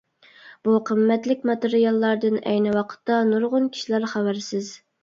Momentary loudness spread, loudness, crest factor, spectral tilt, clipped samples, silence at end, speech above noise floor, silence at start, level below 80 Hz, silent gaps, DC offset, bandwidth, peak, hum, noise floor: 7 LU; -22 LUFS; 14 dB; -6 dB/octave; under 0.1%; 0.25 s; 28 dB; 0.45 s; -70 dBFS; none; under 0.1%; 7.6 kHz; -8 dBFS; none; -49 dBFS